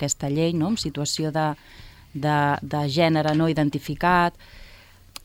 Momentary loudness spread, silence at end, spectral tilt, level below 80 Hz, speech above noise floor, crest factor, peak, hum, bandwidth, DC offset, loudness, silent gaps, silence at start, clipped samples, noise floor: 8 LU; 0.5 s; -5 dB/octave; -48 dBFS; 26 dB; 16 dB; -6 dBFS; none; 16.5 kHz; under 0.1%; -23 LUFS; none; 0 s; under 0.1%; -49 dBFS